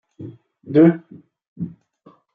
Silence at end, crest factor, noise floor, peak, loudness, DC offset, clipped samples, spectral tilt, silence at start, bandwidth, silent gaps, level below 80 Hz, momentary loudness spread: 0.65 s; 18 dB; -53 dBFS; -2 dBFS; -16 LUFS; under 0.1%; under 0.1%; -11.5 dB/octave; 0.2 s; 4.5 kHz; 1.48-1.56 s; -66 dBFS; 25 LU